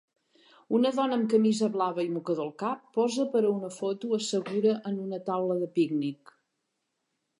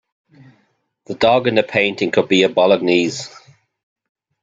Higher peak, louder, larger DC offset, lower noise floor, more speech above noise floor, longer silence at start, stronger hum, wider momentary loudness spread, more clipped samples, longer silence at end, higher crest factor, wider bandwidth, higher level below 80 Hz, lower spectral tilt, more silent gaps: second, -12 dBFS vs 0 dBFS; second, -28 LUFS vs -15 LUFS; neither; first, -81 dBFS vs -64 dBFS; first, 53 dB vs 48 dB; second, 0.7 s vs 1.1 s; neither; second, 8 LU vs 13 LU; neither; first, 1.25 s vs 1.05 s; about the same, 16 dB vs 18 dB; first, 11 kHz vs 9 kHz; second, -84 dBFS vs -58 dBFS; about the same, -5.5 dB/octave vs -4.5 dB/octave; neither